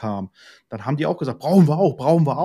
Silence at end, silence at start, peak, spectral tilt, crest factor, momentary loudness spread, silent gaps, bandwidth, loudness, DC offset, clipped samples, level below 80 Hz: 0 s; 0 s; -4 dBFS; -9 dB/octave; 16 dB; 16 LU; none; 13.5 kHz; -19 LUFS; under 0.1%; under 0.1%; -62 dBFS